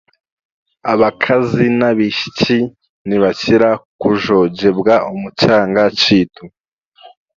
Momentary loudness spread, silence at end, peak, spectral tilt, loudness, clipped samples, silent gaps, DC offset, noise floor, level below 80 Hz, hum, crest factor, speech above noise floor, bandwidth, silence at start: 7 LU; 0.3 s; 0 dBFS; -6 dB/octave; -14 LUFS; under 0.1%; 2.89-3.05 s, 3.85-3.99 s, 6.60-6.77 s, 6.88-6.92 s; under 0.1%; -47 dBFS; -48 dBFS; none; 14 dB; 33 dB; 7.4 kHz; 0.85 s